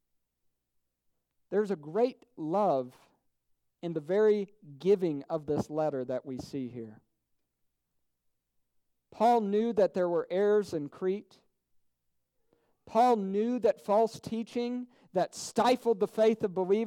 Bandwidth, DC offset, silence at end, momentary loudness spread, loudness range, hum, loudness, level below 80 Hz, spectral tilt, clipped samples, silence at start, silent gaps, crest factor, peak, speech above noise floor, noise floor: 14.5 kHz; under 0.1%; 0 s; 12 LU; 6 LU; none; -30 LUFS; -72 dBFS; -6 dB/octave; under 0.1%; 1.5 s; none; 16 dB; -14 dBFS; 51 dB; -80 dBFS